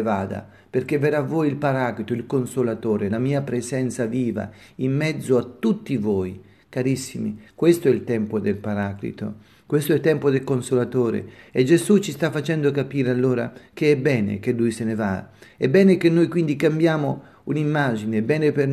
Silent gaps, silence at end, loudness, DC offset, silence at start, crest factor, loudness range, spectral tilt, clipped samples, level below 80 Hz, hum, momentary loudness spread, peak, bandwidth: none; 0 s; -22 LUFS; under 0.1%; 0 s; 18 dB; 4 LU; -7 dB/octave; under 0.1%; -62 dBFS; none; 10 LU; -4 dBFS; 13.5 kHz